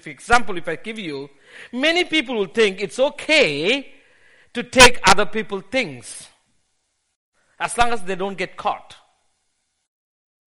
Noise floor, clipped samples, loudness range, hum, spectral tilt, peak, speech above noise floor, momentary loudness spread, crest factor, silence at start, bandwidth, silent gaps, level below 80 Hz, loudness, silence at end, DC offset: -71 dBFS; under 0.1%; 10 LU; none; -2.5 dB/octave; 0 dBFS; 52 dB; 19 LU; 20 dB; 0 s; 11.5 kHz; 7.16-7.32 s; -42 dBFS; -18 LUFS; 0.6 s; under 0.1%